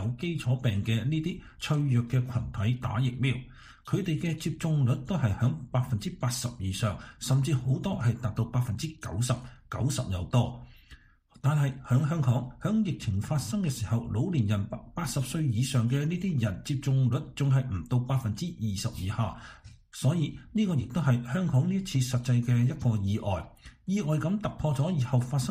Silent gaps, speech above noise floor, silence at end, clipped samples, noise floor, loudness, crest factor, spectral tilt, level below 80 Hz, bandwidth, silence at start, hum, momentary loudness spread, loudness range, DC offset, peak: none; 27 dB; 0 s; under 0.1%; -55 dBFS; -29 LUFS; 16 dB; -6.5 dB/octave; -50 dBFS; 15.5 kHz; 0 s; none; 6 LU; 2 LU; under 0.1%; -12 dBFS